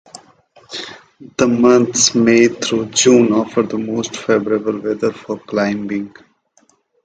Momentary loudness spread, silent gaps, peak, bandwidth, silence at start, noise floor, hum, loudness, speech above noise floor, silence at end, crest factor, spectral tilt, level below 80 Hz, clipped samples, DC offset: 17 LU; none; 0 dBFS; 9.6 kHz; 0.15 s; -57 dBFS; none; -15 LUFS; 42 dB; 0.95 s; 16 dB; -3.5 dB/octave; -56 dBFS; under 0.1%; under 0.1%